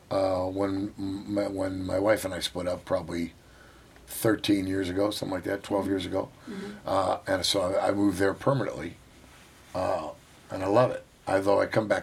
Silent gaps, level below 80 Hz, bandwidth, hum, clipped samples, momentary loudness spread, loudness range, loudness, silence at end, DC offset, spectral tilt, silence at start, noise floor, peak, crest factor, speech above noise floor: none; -58 dBFS; 16.5 kHz; none; under 0.1%; 12 LU; 2 LU; -28 LUFS; 0 s; under 0.1%; -5 dB/octave; 0.1 s; -53 dBFS; -8 dBFS; 20 dB; 25 dB